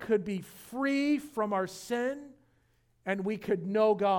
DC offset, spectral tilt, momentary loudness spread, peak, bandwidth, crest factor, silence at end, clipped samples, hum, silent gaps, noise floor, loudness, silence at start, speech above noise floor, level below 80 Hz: under 0.1%; -6 dB/octave; 12 LU; -14 dBFS; 19 kHz; 16 dB; 0 s; under 0.1%; none; none; -69 dBFS; -31 LUFS; 0 s; 39 dB; -70 dBFS